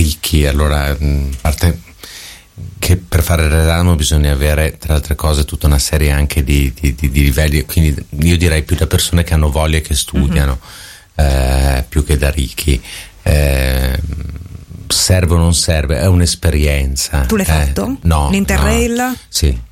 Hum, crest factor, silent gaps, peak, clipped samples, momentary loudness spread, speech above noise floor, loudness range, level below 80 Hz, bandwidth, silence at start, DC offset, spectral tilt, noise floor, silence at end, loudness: none; 14 dB; none; 0 dBFS; under 0.1%; 9 LU; 21 dB; 3 LU; -16 dBFS; 16.5 kHz; 0 s; under 0.1%; -5 dB/octave; -34 dBFS; 0.05 s; -14 LUFS